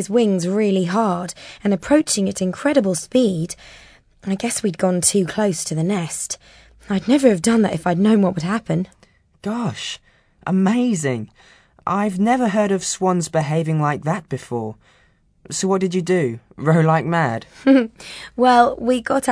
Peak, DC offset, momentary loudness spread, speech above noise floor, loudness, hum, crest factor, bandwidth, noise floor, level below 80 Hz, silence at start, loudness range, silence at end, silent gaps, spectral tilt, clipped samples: -2 dBFS; under 0.1%; 13 LU; 39 dB; -19 LUFS; none; 18 dB; 11 kHz; -57 dBFS; -54 dBFS; 0 s; 4 LU; 0 s; none; -5.5 dB/octave; under 0.1%